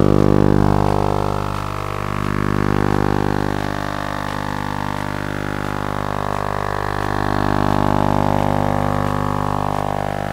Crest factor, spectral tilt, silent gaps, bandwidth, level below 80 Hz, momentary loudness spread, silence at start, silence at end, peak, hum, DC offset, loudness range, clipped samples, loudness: 18 dB; -7 dB/octave; none; 16 kHz; -30 dBFS; 8 LU; 0 s; 0 s; -2 dBFS; 50 Hz at -25 dBFS; under 0.1%; 4 LU; under 0.1%; -20 LUFS